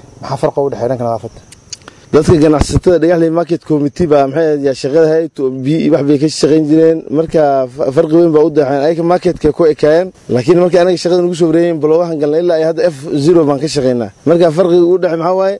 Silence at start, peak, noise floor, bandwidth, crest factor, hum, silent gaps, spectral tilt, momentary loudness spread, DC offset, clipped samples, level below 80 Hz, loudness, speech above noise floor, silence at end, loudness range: 0.2 s; 0 dBFS; -33 dBFS; 11.5 kHz; 10 dB; none; none; -7 dB/octave; 7 LU; under 0.1%; under 0.1%; -34 dBFS; -11 LUFS; 22 dB; 0 s; 2 LU